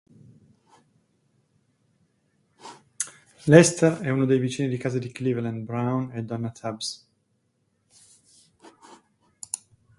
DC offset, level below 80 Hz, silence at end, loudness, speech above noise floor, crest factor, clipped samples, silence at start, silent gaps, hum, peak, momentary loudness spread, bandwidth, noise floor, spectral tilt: under 0.1%; -64 dBFS; 0.45 s; -24 LUFS; 49 dB; 26 dB; under 0.1%; 2.65 s; none; none; 0 dBFS; 19 LU; 11.5 kHz; -71 dBFS; -5.5 dB/octave